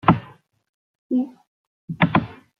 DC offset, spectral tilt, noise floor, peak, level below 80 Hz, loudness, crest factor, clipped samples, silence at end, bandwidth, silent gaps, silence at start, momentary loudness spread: under 0.1%; -9.5 dB/octave; -47 dBFS; -2 dBFS; -52 dBFS; -23 LUFS; 22 dB; under 0.1%; 0.25 s; 5 kHz; 0.69-1.10 s, 1.47-1.88 s; 0.05 s; 11 LU